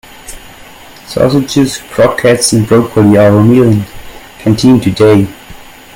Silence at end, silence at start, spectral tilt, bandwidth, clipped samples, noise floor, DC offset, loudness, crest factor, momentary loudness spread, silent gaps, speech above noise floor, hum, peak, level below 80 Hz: 0.3 s; 0.25 s; -6 dB/octave; 17 kHz; 0.3%; -33 dBFS; under 0.1%; -9 LUFS; 10 dB; 14 LU; none; 26 dB; none; 0 dBFS; -38 dBFS